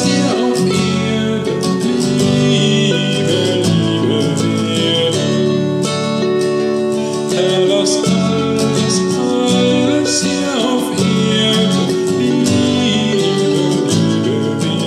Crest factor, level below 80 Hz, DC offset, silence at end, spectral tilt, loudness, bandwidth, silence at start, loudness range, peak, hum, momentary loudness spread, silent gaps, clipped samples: 12 dB; -52 dBFS; under 0.1%; 0 s; -5 dB/octave; -14 LUFS; 14 kHz; 0 s; 1 LU; -2 dBFS; none; 4 LU; none; under 0.1%